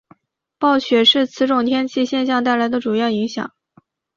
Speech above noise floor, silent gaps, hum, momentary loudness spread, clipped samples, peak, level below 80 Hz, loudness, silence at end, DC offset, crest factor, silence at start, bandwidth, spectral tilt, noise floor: 39 dB; none; none; 9 LU; under 0.1%; -4 dBFS; -62 dBFS; -17 LUFS; 0.7 s; under 0.1%; 16 dB; 0.6 s; 7.4 kHz; -4.5 dB/octave; -56 dBFS